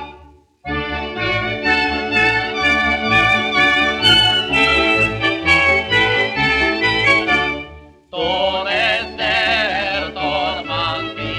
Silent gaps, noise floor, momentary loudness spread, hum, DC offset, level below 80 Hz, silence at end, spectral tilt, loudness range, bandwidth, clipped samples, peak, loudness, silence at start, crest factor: none; -45 dBFS; 10 LU; none; under 0.1%; -38 dBFS; 0 s; -4 dB/octave; 5 LU; 15.5 kHz; under 0.1%; 0 dBFS; -15 LUFS; 0 s; 16 dB